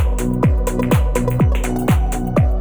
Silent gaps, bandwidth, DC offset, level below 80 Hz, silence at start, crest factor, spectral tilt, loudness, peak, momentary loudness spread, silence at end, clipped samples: none; over 20 kHz; under 0.1%; -20 dBFS; 0 s; 14 dB; -7 dB/octave; -18 LUFS; -2 dBFS; 3 LU; 0 s; under 0.1%